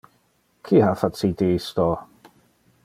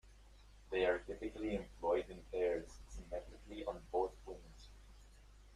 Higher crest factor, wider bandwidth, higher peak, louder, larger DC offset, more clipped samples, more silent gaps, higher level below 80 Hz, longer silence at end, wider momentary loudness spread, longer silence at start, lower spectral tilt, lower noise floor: about the same, 20 dB vs 20 dB; first, 15.5 kHz vs 12.5 kHz; first, -4 dBFS vs -22 dBFS; first, -22 LUFS vs -41 LUFS; neither; neither; neither; first, -52 dBFS vs -58 dBFS; first, 0.8 s vs 0 s; second, 6 LU vs 18 LU; first, 0.65 s vs 0.05 s; first, -7.5 dB/octave vs -5.5 dB/octave; first, -65 dBFS vs -61 dBFS